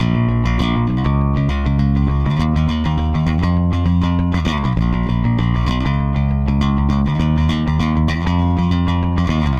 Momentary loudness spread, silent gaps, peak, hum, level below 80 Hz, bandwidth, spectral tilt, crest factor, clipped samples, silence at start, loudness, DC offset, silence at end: 2 LU; none; -6 dBFS; none; -22 dBFS; 7.4 kHz; -8 dB/octave; 10 dB; under 0.1%; 0 s; -17 LUFS; under 0.1%; 0 s